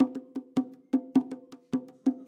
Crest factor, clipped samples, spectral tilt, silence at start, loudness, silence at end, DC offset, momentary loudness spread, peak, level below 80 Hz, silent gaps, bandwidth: 18 dB; under 0.1%; -7.5 dB/octave; 0 s; -31 LUFS; 0.05 s; under 0.1%; 13 LU; -12 dBFS; -76 dBFS; none; 8.2 kHz